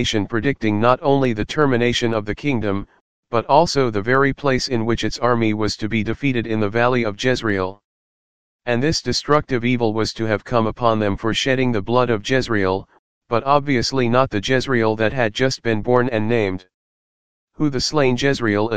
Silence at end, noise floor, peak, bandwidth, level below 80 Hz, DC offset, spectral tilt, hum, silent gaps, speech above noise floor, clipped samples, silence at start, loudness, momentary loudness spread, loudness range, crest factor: 0 s; under -90 dBFS; 0 dBFS; 9.8 kHz; -44 dBFS; 2%; -5.5 dB/octave; none; 3.01-3.23 s, 7.84-8.59 s, 12.99-13.21 s, 16.74-17.47 s; over 71 dB; under 0.1%; 0 s; -19 LUFS; 6 LU; 2 LU; 18 dB